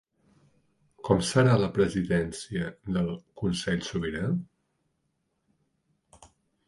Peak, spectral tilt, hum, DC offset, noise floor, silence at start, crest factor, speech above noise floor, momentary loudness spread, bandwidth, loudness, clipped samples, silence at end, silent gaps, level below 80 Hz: -6 dBFS; -6 dB/octave; none; under 0.1%; -77 dBFS; 1.05 s; 22 dB; 50 dB; 11 LU; 11.5 kHz; -28 LUFS; under 0.1%; 2.25 s; none; -52 dBFS